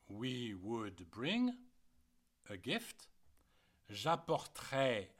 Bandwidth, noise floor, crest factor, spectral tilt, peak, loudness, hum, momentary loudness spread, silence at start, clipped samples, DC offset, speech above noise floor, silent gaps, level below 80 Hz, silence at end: 16.5 kHz; -74 dBFS; 20 dB; -5 dB/octave; -22 dBFS; -40 LUFS; none; 15 LU; 0.1 s; under 0.1%; under 0.1%; 33 dB; none; -74 dBFS; 0.1 s